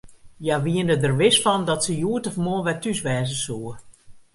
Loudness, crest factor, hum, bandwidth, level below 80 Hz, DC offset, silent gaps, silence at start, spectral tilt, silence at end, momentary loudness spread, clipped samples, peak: -22 LUFS; 18 dB; none; 11.5 kHz; -54 dBFS; under 0.1%; none; 0.05 s; -4.5 dB/octave; 0.15 s; 11 LU; under 0.1%; -6 dBFS